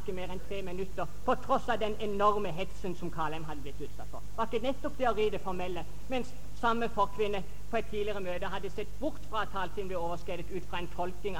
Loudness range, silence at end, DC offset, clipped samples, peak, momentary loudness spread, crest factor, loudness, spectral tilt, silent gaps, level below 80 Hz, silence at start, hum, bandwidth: 3 LU; 0 s; 3%; under 0.1%; -12 dBFS; 10 LU; 20 dB; -35 LUFS; -5.5 dB/octave; none; -48 dBFS; 0 s; 50 Hz at -45 dBFS; 17.5 kHz